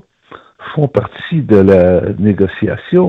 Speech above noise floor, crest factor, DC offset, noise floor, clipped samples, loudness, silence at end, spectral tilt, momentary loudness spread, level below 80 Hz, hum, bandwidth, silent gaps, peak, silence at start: 28 dB; 12 dB; under 0.1%; -39 dBFS; 0.2%; -12 LUFS; 0 s; -10 dB/octave; 11 LU; -46 dBFS; none; 5.2 kHz; none; 0 dBFS; 0.3 s